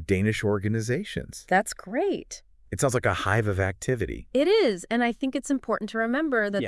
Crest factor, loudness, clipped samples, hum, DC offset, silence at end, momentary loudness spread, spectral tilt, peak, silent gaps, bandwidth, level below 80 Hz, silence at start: 18 dB; -26 LUFS; under 0.1%; none; under 0.1%; 0 s; 8 LU; -5.5 dB/octave; -8 dBFS; none; 12 kHz; -50 dBFS; 0 s